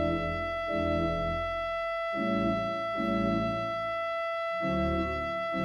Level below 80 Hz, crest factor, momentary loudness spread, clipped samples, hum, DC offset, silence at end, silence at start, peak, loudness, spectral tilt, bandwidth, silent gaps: -46 dBFS; 14 dB; 3 LU; under 0.1%; none; under 0.1%; 0 s; 0 s; -16 dBFS; -30 LUFS; -7 dB/octave; 11.5 kHz; none